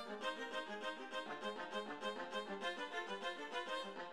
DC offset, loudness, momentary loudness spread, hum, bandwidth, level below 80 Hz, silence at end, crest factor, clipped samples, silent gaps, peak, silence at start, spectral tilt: under 0.1%; -45 LUFS; 2 LU; none; 13.5 kHz; -86 dBFS; 0 s; 16 dB; under 0.1%; none; -30 dBFS; 0 s; -3 dB/octave